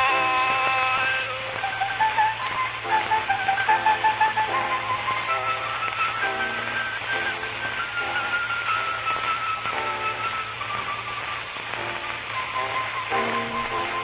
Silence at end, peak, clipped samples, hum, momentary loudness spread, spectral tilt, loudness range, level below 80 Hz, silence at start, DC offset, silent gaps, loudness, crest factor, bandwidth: 0 s; -8 dBFS; under 0.1%; none; 8 LU; 0 dB/octave; 5 LU; -56 dBFS; 0 s; under 0.1%; none; -24 LUFS; 16 dB; 4 kHz